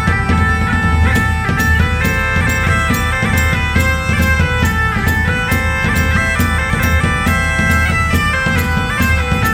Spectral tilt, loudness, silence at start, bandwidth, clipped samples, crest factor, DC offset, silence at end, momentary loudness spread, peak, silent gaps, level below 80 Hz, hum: -5 dB/octave; -14 LUFS; 0 s; 17 kHz; under 0.1%; 12 dB; under 0.1%; 0 s; 2 LU; -2 dBFS; none; -20 dBFS; none